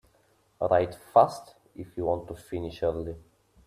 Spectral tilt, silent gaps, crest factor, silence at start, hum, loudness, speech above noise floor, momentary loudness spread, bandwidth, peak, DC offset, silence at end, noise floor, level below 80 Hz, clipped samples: -7 dB/octave; none; 22 dB; 0.6 s; none; -28 LUFS; 39 dB; 22 LU; 14.5 kHz; -6 dBFS; under 0.1%; 0.45 s; -66 dBFS; -56 dBFS; under 0.1%